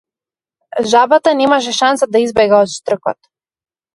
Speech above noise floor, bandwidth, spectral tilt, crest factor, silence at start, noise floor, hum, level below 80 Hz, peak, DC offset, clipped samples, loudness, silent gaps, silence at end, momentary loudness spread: over 78 dB; 11.5 kHz; -3.5 dB/octave; 14 dB; 0.75 s; under -90 dBFS; none; -54 dBFS; 0 dBFS; under 0.1%; under 0.1%; -13 LUFS; none; 0.8 s; 10 LU